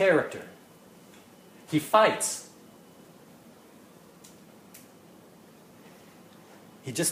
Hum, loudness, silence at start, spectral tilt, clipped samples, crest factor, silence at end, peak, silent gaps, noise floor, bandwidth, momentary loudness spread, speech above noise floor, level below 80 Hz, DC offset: none; -26 LUFS; 0 s; -3.5 dB/octave; under 0.1%; 24 dB; 0 s; -8 dBFS; none; -53 dBFS; 15.5 kHz; 30 LU; 29 dB; -76 dBFS; under 0.1%